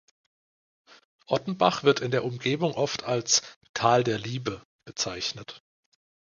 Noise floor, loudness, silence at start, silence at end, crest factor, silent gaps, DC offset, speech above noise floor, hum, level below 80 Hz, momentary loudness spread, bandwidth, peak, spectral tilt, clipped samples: under -90 dBFS; -26 LUFS; 1.3 s; 0.8 s; 24 dB; 3.56-3.61 s, 3.69-3.74 s, 4.65-4.79 s; under 0.1%; over 64 dB; none; -64 dBFS; 14 LU; 10 kHz; -6 dBFS; -3.5 dB/octave; under 0.1%